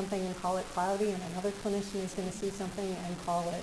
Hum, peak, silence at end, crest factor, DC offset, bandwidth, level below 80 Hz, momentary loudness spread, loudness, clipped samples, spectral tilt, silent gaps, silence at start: none; -20 dBFS; 0 s; 14 dB; under 0.1%; 11 kHz; -56 dBFS; 5 LU; -35 LUFS; under 0.1%; -5 dB/octave; none; 0 s